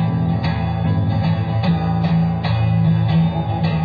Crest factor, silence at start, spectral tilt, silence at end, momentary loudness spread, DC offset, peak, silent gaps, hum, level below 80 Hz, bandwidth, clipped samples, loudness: 10 dB; 0 s; -10 dB/octave; 0 s; 4 LU; under 0.1%; -8 dBFS; none; none; -36 dBFS; 5 kHz; under 0.1%; -18 LUFS